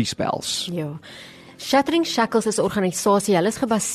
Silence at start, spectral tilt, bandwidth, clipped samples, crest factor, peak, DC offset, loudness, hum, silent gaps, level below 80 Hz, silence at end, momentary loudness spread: 0 s; -4 dB/octave; 13 kHz; under 0.1%; 16 dB; -6 dBFS; under 0.1%; -21 LUFS; none; none; -56 dBFS; 0 s; 17 LU